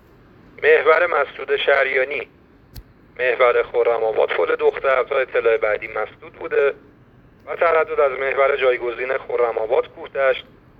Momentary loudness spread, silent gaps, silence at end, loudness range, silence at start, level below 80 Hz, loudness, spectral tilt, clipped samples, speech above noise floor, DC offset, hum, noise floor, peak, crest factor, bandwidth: 11 LU; none; 0.4 s; 2 LU; 0.6 s; -54 dBFS; -19 LUFS; -5.5 dB/octave; under 0.1%; 31 dB; under 0.1%; none; -50 dBFS; -2 dBFS; 18 dB; 5.2 kHz